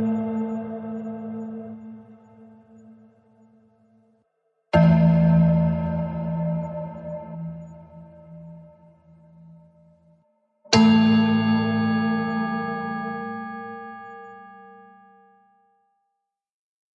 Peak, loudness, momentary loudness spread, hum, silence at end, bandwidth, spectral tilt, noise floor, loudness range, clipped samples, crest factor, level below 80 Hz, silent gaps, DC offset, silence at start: -2 dBFS; -22 LUFS; 26 LU; none; 2.2 s; 7.6 kHz; -7 dB/octave; -80 dBFS; 19 LU; under 0.1%; 22 dB; -52 dBFS; none; under 0.1%; 0 s